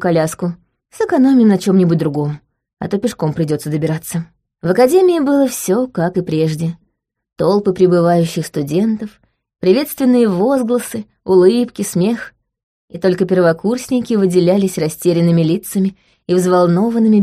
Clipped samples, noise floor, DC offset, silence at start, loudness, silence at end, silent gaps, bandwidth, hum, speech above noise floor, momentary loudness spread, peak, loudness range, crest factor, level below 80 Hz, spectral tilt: under 0.1%; -67 dBFS; under 0.1%; 0 s; -15 LUFS; 0 s; 12.63-12.88 s; 15.5 kHz; none; 53 dB; 12 LU; 0 dBFS; 2 LU; 14 dB; -54 dBFS; -6.5 dB/octave